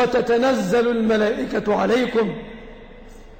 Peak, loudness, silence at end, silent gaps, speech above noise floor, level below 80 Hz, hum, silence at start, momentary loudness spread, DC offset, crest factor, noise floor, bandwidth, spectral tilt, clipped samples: -10 dBFS; -20 LUFS; 0 s; none; 22 dB; -46 dBFS; none; 0 s; 12 LU; under 0.1%; 10 dB; -41 dBFS; 16.5 kHz; -5.5 dB/octave; under 0.1%